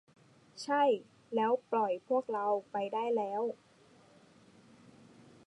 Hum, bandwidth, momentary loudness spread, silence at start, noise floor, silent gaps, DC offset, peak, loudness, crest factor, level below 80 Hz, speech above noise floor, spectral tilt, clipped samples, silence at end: none; 11 kHz; 9 LU; 0.55 s; -62 dBFS; none; under 0.1%; -18 dBFS; -33 LUFS; 16 dB; -86 dBFS; 30 dB; -5 dB/octave; under 0.1%; 1.9 s